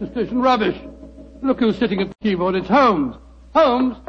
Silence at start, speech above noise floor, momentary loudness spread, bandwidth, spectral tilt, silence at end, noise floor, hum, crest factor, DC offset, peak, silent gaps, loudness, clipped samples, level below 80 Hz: 0 s; 21 dB; 10 LU; 6.8 kHz; -7 dB/octave; 0.05 s; -39 dBFS; none; 16 dB; under 0.1%; -4 dBFS; none; -18 LUFS; under 0.1%; -44 dBFS